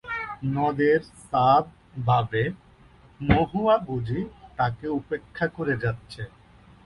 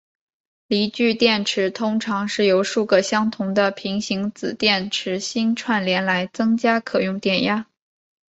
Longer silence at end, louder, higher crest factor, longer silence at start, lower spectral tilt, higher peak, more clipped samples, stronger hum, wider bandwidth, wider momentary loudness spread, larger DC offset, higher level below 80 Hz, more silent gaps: about the same, 0.6 s vs 0.65 s; second, -25 LUFS vs -20 LUFS; about the same, 20 dB vs 18 dB; second, 0.05 s vs 0.7 s; first, -8 dB/octave vs -4.5 dB/octave; about the same, -4 dBFS vs -2 dBFS; neither; neither; first, 11 kHz vs 8.2 kHz; first, 15 LU vs 6 LU; neither; first, -46 dBFS vs -62 dBFS; neither